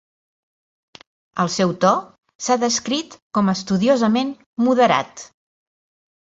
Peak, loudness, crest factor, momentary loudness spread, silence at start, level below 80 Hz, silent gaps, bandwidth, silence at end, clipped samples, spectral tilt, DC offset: -2 dBFS; -19 LUFS; 20 dB; 11 LU; 1.35 s; -62 dBFS; 2.35-2.39 s, 3.22-3.31 s, 4.46-4.53 s; 8 kHz; 1 s; under 0.1%; -4.5 dB/octave; under 0.1%